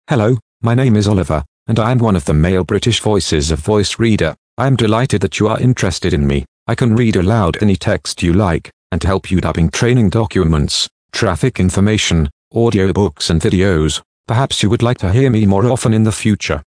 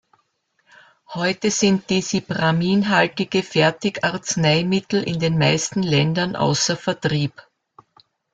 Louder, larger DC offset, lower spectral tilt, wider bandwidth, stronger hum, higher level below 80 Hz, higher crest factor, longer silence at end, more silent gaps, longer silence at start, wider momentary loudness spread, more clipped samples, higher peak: first, -14 LUFS vs -20 LUFS; neither; first, -6 dB/octave vs -4.5 dB/octave; first, 10.5 kHz vs 9.4 kHz; neither; first, -30 dBFS vs -56 dBFS; about the same, 14 dB vs 18 dB; second, 0.1 s vs 1.05 s; first, 0.42-0.60 s, 1.48-1.66 s, 4.38-4.57 s, 6.48-6.66 s, 8.73-8.90 s, 10.91-11.09 s, 12.32-12.51 s, 14.05-14.24 s vs none; second, 0.1 s vs 1.1 s; about the same, 5 LU vs 5 LU; neither; first, 0 dBFS vs -4 dBFS